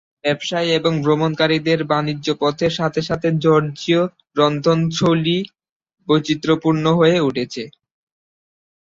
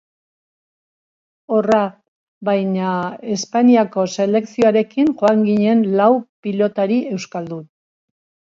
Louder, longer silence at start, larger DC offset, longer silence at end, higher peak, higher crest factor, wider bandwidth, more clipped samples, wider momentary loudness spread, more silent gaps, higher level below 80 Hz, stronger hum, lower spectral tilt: about the same, -18 LUFS vs -17 LUFS; second, 0.25 s vs 1.5 s; neither; first, 1.1 s vs 0.85 s; about the same, -2 dBFS vs -2 dBFS; about the same, 18 dB vs 16 dB; about the same, 7.6 kHz vs 7.6 kHz; neither; second, 7 LU vs 11 LU; second, 5.71-5.80 s vs 2.08-2.41 s, 6.29-6.43 s; first, -54 dBFS vs -64 dBFS; neither; about the same, -6 dB/octave vs -6.5 dB/octave